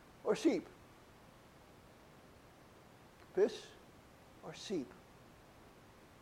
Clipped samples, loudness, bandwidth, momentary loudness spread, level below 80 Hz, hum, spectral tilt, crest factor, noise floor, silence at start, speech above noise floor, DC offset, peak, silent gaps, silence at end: under 0.1%; -38 LUFS; 16 kHz; 25 LU; -72 dBFS; none; -5 dB/octave; 22 dB; -61 dBFS; 0.25 s; 24 dB; under 0.1%; -20 dBFS; none; 0.55 s